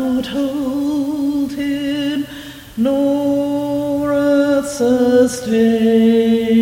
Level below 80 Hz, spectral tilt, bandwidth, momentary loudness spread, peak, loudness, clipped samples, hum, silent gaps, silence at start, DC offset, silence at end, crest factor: -48 dBFS; -5.5 dB/octave; 17 kHz; 8 LU; -2 dBFS; -16 LUFS; under 0.1%; none; none; 0 s; under 0.1%; 0 s; 12 dB